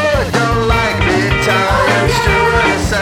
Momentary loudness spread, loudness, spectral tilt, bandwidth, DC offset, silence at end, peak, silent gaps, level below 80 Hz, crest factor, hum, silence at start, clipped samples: 2 LU; -12 LUFS; -5 dB/octave; 17.5 kHz; under 0.1%; 0 s; 0 dBFS; none; -24 dBFS; 12 dB; none; 0 s; under 0.1%